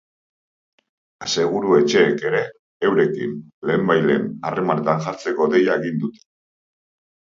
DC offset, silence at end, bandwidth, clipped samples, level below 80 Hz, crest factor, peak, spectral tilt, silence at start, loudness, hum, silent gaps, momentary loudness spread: under 0.1%; 1.25 s; 7.6 kHz; under 0.1%; -64 dBFS; 20 dB; -2 dBFS; -5.5 dB/octave; 1.2 s; -20 LUFS; none; 2.59-2.80 s, 3.54-3.62 s; 10 LU